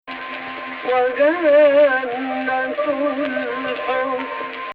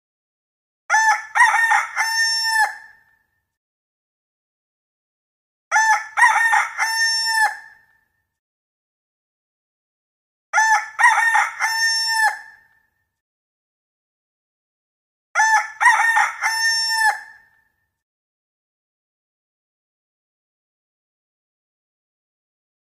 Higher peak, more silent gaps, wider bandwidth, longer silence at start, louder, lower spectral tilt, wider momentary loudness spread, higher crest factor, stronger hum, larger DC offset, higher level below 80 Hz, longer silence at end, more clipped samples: about the same, -4 dBFS vs -2 dBFS; second, none vs 3.57-5.71 s, 8.39-10.53 s, 13.21-15.34 s; second, 4.9 kHz vs 15 kHz; second, 0.05 s vs 0.9 s; about the same, -19 LUFS vs -17 LUFS; first, -6.5 dB/octave vs 5.5 dB/octave; first, 15 LU vs 6 LU; second, 14 dB vs 20 dB; neither; neither; first, -62 dBFS vs -80 dBFS; second, 0 s vs 5.6 s; neither